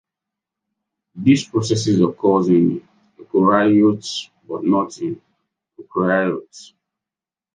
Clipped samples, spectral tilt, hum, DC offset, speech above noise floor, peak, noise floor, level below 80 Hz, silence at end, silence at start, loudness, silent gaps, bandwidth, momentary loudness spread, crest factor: under 0.1%; -6 dB/octave; none; under 0.1%; 72 dB; -2 dBFS; -89 dBFS; -60 dBFS; 0.95 s; 1.15 s; -18 LUFS; none; 9.6 kHz; 14 LU; 18 dB